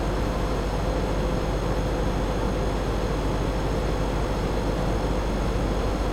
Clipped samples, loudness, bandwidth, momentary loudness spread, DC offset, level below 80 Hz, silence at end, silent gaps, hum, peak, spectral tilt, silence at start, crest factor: under 0.1%; -27 LUFS; 13.5 kHz; 1 LU; under 0.1%; -28 dBFS; 0 s; none; none; -12 dBFS; -6.5 dB/octave; 0 s; 12 dB